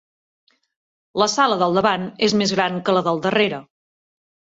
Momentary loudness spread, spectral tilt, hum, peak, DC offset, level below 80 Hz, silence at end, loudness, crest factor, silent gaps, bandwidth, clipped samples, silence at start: 4 LU; -4 dB/octave; none; -4 dBFS; under 0.1%; -62 dBFS; 0.9 s; -19 LUFS; 18 dB; none; 8 kHz; under 0.1%; 1.15 s